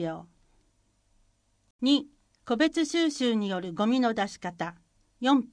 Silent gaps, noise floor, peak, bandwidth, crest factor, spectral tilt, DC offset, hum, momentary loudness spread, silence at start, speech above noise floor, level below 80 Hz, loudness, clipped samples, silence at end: 1.70-1.79 s; -69 dBFS; -12 dBFS; 10.5 kHz; 18 dB; -4.5 dB/octave; under 0.1%; none; 11 LU; 0 s; 42 dB; -66 dBFS; -28 LUFS; under 0.1%; 0.05 s